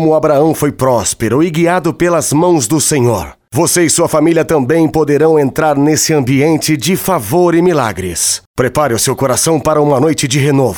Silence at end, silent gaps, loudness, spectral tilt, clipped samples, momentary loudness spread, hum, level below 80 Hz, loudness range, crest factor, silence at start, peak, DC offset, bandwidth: 0 s; 8.46-8.54 s; -11 LUFS; -4.5 dB/octave; under 0.1%; 4 LU; none; -40 dBFS; 1 LU; 10 dB; 0 s; 0 dBFS; under 0.1%; over 20 kHz